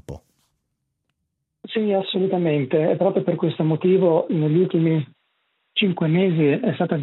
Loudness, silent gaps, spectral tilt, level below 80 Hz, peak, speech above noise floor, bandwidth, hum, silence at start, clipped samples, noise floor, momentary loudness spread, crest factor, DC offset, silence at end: -20 LUFS; none; -9.5 dB/octave; -60 dBFS; -6 dBFS; 58 dB; 4.1 kHz; none; 0.1 s; under 0.1%; -77 dBFS; 7 LU; 14 dB; under 0.1%; 0 s